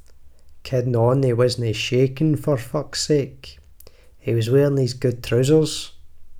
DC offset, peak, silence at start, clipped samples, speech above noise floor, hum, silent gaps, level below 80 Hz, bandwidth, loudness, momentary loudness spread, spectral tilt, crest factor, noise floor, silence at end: under 0.1%; -4 dBFS; 0.1 s; under 0.1%; 26 dB; none; none; -46 dBFS; 16 kHz; -20 LUFS; 9 LU; -6 dB/octave; 16 dB; -45 dBFS; 0 s